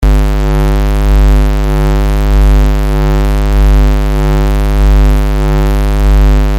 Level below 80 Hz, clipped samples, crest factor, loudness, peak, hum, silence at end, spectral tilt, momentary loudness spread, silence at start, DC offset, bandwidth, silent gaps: -8 dBFS; under 0.1%; 6 dB; -11 LUFS; -2 dBFS; 50 Hz at -10 dBFS; 0 s; -7 dB/octave; 3 LU; 0 s; under 0.1%; 15.5 kHz; none